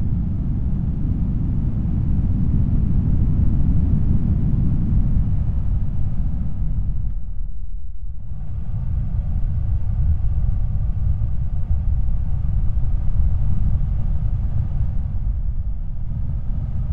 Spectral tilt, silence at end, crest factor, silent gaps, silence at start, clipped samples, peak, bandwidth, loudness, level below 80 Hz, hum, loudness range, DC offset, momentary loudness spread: -12 dB/octave; 0 s; 14 dB; none; 0 s; under 0.1%; -4 dBFS; 2.4 kHz; -23 LUFS; -22 dBFS; none; 7 LU; 4%; 9 LU